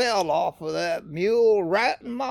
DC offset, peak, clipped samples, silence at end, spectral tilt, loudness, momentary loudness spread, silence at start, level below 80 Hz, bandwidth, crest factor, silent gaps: under 0.1%; -10 dBFS; under 0.1%; 0 s; -4 dB/octave; -23 LUFS; 8 LU; 0 s; -62 dBFS; 13 kHz; 14 dB; none